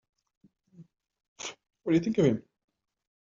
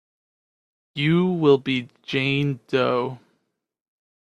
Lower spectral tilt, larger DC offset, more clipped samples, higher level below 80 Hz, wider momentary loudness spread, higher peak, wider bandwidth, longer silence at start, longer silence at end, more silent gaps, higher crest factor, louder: about the same, -7 dB/octave vs -7.5 dB/octave; neither; neither; about the same, -68 dBFS vs -64 dBFS; first, 15 LU vs 9 LU; second, -12 dBFS vs -4 dBFS; second, 7.4 kHz vs 8.8 kHz; second, 0.8 s vs 0.95 s; second, 0.8 s vs 1.15 s; first, 1.28-1.36 s vs none; about the same, 22 dB vs 20 dB; second, -29 LUFS vs -22 LUFS